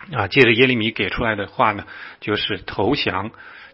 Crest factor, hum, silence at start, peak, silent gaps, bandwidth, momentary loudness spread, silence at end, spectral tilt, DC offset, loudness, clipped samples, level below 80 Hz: 20 dB; none; 0 s; 0 dBFS; none; 7.6 kHz; 15 LU; 0.05 s; -7 dB/octave; under 0.1%; -18 LUFS; under 0.1%; -46 dBFS